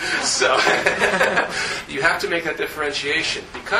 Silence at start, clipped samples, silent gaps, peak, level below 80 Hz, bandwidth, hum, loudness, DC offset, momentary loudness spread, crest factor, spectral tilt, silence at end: 0 s; under 0.1%; none; 0 dBFS; -50 dBFS; 15 kHz; none; -19 LUFS; under 0.1%; 8 LU; 20 dB; -1.5 dB/octave; 0 s